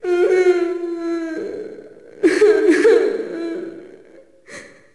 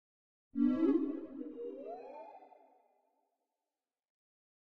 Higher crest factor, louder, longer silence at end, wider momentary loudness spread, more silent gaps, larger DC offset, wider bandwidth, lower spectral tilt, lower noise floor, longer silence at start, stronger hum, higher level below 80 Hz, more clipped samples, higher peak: second, 14 dB vs 20 dB; first, -17 LUFS vs -36 LUFS; second, 0.25 s vs 2.3 s; about the same, 22 LU vs 20 LU; neither; first, 0.2% vs under 0.1%; first, 11.5 kHz vs 4.7 kHz; second, -4 dB/octave vs -8.5 dB/octave; second, -47 dBFS vs under -90 dBFS; second, 0.05 s vs 0.55 s; neither; first, -60 dBFS vs -76 dBFS; neither; first, -4 dBFS vs -20 dBFS